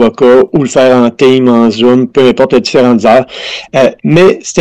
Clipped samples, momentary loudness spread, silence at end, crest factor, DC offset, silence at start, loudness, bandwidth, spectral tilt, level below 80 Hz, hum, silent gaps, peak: 1%; 4 LU; 0 s; 6 dB; 0.8%; 0 s; -7 LUFS; 9.4 kHz; -5.5 dB/octave; -44 dBFS; none; none; 0 dBFS